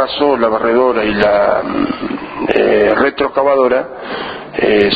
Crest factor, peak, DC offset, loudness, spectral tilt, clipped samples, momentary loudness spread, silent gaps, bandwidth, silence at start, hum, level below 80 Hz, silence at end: 14 dB; 0 dBFS; under 0.1%; -14 LUFS; -7.5 dB/octave; under 0.1%; 11 LU; none; 5 kHz; 0 s; none; -42 dBFS; 0 s